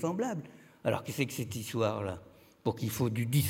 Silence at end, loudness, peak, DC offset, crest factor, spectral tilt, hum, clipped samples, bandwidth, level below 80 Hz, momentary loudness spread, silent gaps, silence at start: 0 s; -34 LUFS; -14 dBFS; under 0.1%; 20 dB; -5.5 dB/octave; none; under 0.1%; 17 kHz; -68 dBFS; 8 LU; none; 0 s